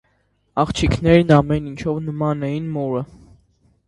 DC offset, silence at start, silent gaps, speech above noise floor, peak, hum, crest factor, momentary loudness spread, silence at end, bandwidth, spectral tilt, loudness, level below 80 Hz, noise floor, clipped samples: under 0.1%; 0.55 s; none; 46 dB; 0 dBFS; none; 20 dB; 11 LU; 0.85 s; 11 kHz; -7 dB/octave; -19 LUFS; -36 dBFS; -64 dBFS; under 0.1%